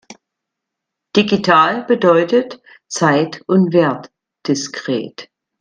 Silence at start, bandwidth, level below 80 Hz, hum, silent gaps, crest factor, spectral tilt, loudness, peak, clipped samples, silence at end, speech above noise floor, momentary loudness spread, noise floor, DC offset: 0.1 s; 10 kHz; -60 dBFS; none; none; 16 dB; -5 dB/octave; -15 LUFS; 0 dBFS; under 0.1%; 0.35 s; 65 dB; 15 LU; -80 dBFS; under 0.1%